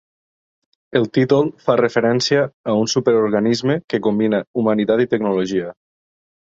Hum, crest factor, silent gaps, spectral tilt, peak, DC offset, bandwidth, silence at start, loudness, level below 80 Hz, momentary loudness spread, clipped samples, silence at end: none; 18 dB; 2.54-2.64 s, 3.84-3.88 s, 4.47-4.54 s; -5.5 dB/octave; -2 dBFS; under 0.1%; 7.8 kHz; 0.9 s; -18 LUFS; -58 dBFS; 4 LU; under 0.1%; 0.75 s